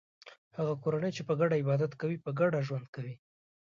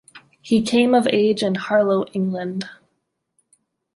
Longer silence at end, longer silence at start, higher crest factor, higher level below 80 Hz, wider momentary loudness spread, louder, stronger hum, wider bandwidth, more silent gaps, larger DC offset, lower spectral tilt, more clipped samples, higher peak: second, 0.55 s vs 1.2 s; about the same, 0.25 s vs 0.15 s; about the same, 16 dB vs 18 dB; second, -76 dBFS vs -64 dBFS; first, 14 LU vs 11 LU; second, -32 LUFS vs -19 LUFS; neither; second, 7.4 kHz vs 11.5 kHz; first, 0.38-0.51 s, 2.88-2.93 s vs none; neither; first, -8 dB/octave vs -5.5 dB/octave; neither; second, -16 dBFS vs -4 dBFS